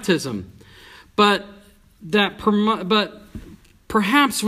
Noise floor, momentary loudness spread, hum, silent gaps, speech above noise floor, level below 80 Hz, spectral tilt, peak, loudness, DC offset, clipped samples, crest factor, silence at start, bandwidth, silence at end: -46 dBFS; 16 LU; none; none; 27 dB; -50 dBFS; -4 dB/octave; 0 dBFS; -20 LUFS; under 0.1%; under 0.1%; 20 dB; 0 s; 15.5 kHz; 0 s